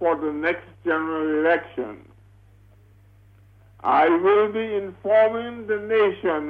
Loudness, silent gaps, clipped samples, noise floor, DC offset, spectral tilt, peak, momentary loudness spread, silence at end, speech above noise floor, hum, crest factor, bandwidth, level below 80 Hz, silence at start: -22 LUFS; none; under 0.1%; -52 dBFS; under 0.1%; -7.5 dB/octave; -8 dBFS; 11 LU; 0 s; 31 dB; 50 Hz at -50 dBFS; 14 dB; 4.8 kHz; -60 dBFS; 0 s